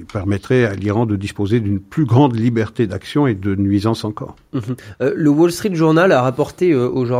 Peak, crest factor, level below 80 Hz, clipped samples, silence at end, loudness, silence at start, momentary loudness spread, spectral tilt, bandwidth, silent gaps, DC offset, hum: 0 dBFS; 16 dB; -50 dBFS; under 0.1%; 0 s; -17 LUFS; 0 s; 10 LU; -7.5 dB/octave; 15.5 kHz; none; under 0.1%; none